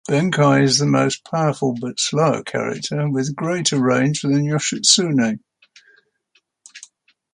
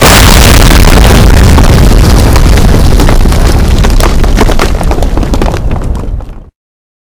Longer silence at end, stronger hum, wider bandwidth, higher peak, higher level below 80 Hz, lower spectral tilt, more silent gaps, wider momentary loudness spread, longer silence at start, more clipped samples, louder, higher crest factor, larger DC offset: second, 0.5 s vs 0.7 s; neither; second, 11.5 kHz vs over 20 kHz; about the same, 0 dBFS vs 0 dBFS; second, -62 dBFS vs -6 dBFS; about the same, -4 dB/octave vs -5 dB/octave; neither; about the same, 9 LU vs 11 LU; about the same, 0.1 s vs 0 s; second, under 0.1% vs 30%; second, -18 LUFS vs -6 LUFS; first, 20 dB vs 4 dB; neither